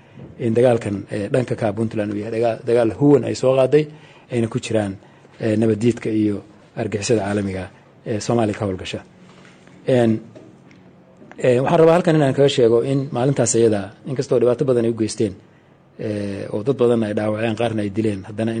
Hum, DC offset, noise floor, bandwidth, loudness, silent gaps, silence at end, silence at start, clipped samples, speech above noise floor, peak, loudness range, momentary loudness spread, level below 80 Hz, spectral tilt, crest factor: none; under 0.1%; -51 dBFS; 9.6 kHz; -19 LUFS; none; 0 s; 0.15 s; under 0.1%; 32 dB; -4 dBFS; 6 LU; 12 LU; -56 dBFS; -6 dB/octave; 16 dB